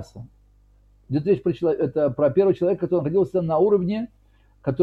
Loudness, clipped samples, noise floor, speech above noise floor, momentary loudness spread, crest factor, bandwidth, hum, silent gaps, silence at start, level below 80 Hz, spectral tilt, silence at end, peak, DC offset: -22 LUFS; under 0.1%; -56 dBFS; 34 dB; 10 LU; 16 dB; 6.4 kHz; 50 Hz at -50 dBFS; none; 0 s; -54 dBFS; -10 dB/octave; 0 s; -6 dBFS; under 0.1%